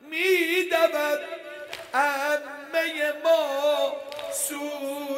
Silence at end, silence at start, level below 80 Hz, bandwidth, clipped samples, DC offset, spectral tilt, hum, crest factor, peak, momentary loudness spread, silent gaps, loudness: 0 s; 0.05 s; -76 dBFS; 16 kHz; under 0.1%; under 0.1%; -0.5 dB/octave; none; 18 dB; -8 dBFS; 11 LU; none; -25 LUFS